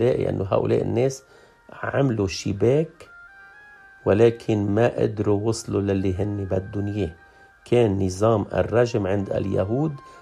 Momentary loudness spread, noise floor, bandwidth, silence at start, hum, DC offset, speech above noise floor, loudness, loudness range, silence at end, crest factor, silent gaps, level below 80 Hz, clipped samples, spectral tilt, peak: 7 LU; -48 dBFS; 11.5 kHz; 0 s; none; under 0.1%; 26 dB; -23 LUFS; 2 LU; 0 s; 18 dB; none; -52 dBFS; under 0.1%; -7 dB/octave; -4 dBFS